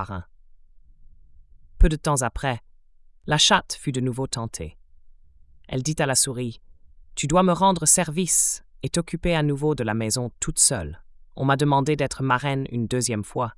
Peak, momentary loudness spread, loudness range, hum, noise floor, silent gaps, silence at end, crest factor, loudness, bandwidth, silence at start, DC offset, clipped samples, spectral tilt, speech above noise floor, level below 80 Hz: -4 dBFS; 14 LU; 6 LU; none; -52 dBFS; none; 0.05 s; 20 dB; -22 LUFS; 12 kHz; 0 s; under 0.1%; under 0.1%; -3.5 dB/octave; 29 dB; -34 dBFS